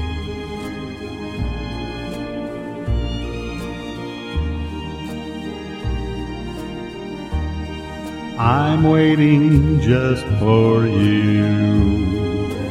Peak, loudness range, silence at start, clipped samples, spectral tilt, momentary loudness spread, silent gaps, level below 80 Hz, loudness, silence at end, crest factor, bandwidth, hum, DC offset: -2 dBFS; 12 LU; 0 s; under 0.1%; -8 dB/octave; 15 LU; none; -30 dBFS; -20 LUFS; 0 s; 16 dB; 11.5 kHz; none; under 0.1%